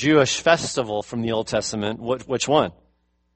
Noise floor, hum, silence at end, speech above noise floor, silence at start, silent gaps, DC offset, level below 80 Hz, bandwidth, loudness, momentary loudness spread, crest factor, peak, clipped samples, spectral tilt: -66 dBFS; none; 0.65 s; 44 dB; 0 s; none; under 0.1%; -54 dBFS; 8.8 kHz; -22 LUFS; 9 LU; 20 dB; -2 dBFS; under 0.1%; -4 dB/octave